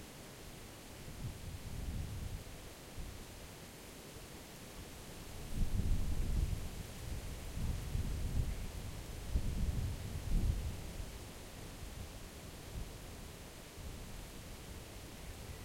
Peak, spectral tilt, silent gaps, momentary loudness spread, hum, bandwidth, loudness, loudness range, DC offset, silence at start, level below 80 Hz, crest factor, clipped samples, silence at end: -22 dBFS; -5 dB/octave; none; 12 LU; none; 16.5 kHz; -45 LUFS; 8 LU; under 0.1%; 0 s; -44 dBFS; 20 dB; under 0.1%; 0 s